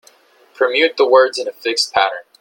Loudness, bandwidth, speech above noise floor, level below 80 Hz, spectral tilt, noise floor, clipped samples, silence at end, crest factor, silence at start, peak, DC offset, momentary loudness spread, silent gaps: -15 LUFS; 17 kHz; 35 dB; -62 dBFS; -1 dB/octave; -50 dBFS; under 0.1%; 0.2 s; 16 dB; 0.6 s; 0 dBFS; under 0.1%; 8 LU; none